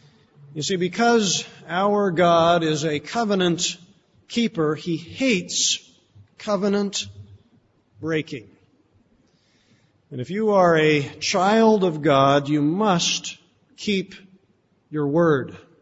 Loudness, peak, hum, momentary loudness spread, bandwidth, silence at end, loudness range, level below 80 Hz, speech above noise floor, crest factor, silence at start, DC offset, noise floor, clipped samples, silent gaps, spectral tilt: -21 LUFS; -6 dBFS; none; 16 LU; 8 kHz; 0.25 s; 9 LU; -62 dBFS; 43 dB; 18 dB; 0.5 s; under 0.1%; -63 dBFS; under 0.1%; none; -4 dB/octave